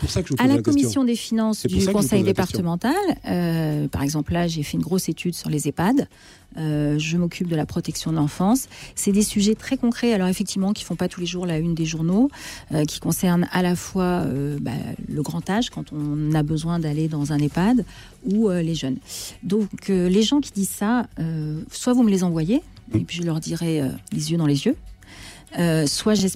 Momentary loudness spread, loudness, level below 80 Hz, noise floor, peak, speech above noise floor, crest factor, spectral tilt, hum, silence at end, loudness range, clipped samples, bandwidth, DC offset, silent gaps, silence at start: 8 LU; -22 LUFS; -44 dBFS; -42 dBFS; -6 dBFS; 21 dB; 16 dB; -5.5 dB/octave; none; 0 s; 3 LU; under 0.1%; 16 kHz; under 0.1%; none; 0 s